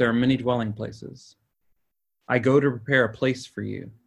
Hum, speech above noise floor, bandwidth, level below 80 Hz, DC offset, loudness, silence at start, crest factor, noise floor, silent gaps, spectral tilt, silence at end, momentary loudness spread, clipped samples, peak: none; 50 dB; 11 kHz; -58 dBFS; under 0.1%; -24 LUFS; 0 s; 20 dB; -74 dBFS; none; -7 dB/octave; 0.15 s; 14 LU; under 0.1%; -4 dBFS